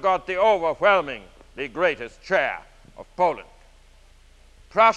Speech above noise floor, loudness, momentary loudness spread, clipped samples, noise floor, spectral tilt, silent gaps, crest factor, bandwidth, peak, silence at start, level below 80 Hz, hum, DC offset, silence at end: 29 dB; -23 LUFS; 17 LU; under 0.1%; -52 dBFS; -4.5 dB/octave; none; 20 dB; 9.8 kHz; -4 dBFS; 0 s; -52 dBFS; none; under 0.1%; 0 s